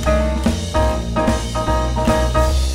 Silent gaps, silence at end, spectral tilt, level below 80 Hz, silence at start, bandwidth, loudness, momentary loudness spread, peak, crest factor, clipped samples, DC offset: none; 0 s; -5.5 dB/octave; -20 dBFS; 0 s; 15.5 kHz; -18 LUFS; 3 LU; -2 dBFS; 14 dB; under 0.1%; under 0.1%